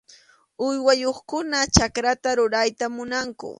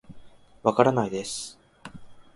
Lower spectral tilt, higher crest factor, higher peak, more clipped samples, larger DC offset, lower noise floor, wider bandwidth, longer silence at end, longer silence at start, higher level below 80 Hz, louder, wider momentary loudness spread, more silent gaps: second, -3.5 dB/octave vs -5 dB/octave; about the same, 24 dB vs 26 dB; about the same, 0 dBFS vs -2 dBFS; neither; neither; first, -54 dBFS vs -47 dBFS; about the same, 11.5 kHz vs 11.5 kHz; about the same, 0.05 s vs 0.15 s; first, 0.6 s vs 0.1 s; first, -42 dBFS vs -60 dBFS; first, -22 LUFS vs -25 LUFS; second, 9 LU vs 24 LU; neither